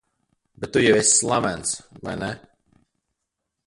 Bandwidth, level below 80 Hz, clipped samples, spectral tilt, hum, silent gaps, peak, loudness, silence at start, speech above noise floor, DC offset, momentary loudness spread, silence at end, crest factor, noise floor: 11.5 kHz; -54 dBFS; under 0.1%; -3 dB/octave; none; none; -4 dBFS; -20 LUFS; 0.6 s; 59 dB; under 0.1%; 17 LU; 1.3 s; 20 dB; -81 dBFS